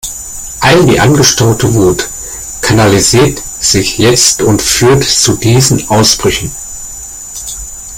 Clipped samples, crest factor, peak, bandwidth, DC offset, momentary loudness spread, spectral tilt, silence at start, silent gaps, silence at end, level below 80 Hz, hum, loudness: 0.2%; 10 dB; 0 dBFS; over 20 kHz; under 0.1%; 15 LU; -3.5 dB/octave; 0.05 s; none; 0 s; -30 dBFS; none; -8 LUFS